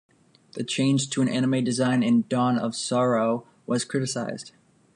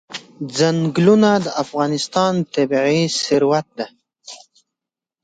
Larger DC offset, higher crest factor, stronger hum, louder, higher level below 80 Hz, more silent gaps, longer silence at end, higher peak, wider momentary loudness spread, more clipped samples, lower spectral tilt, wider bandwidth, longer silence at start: neither; about the same, 14 dB vs 18 dB; neither; second, -24 LUFS vs -17 LUFS; second, -70 dBFS vs -60 dBFS; neither; second, 0.45 s vs 0.85 s; second, -12 dBFS vs -2 dBFS; second, 11 LU vs 17 LU; neither; about the same, -5 dB/octave vs -5 dB/octave; first, 11.5 kHz vs 9.4 kHz; first, 0.55 s vs 0.1 s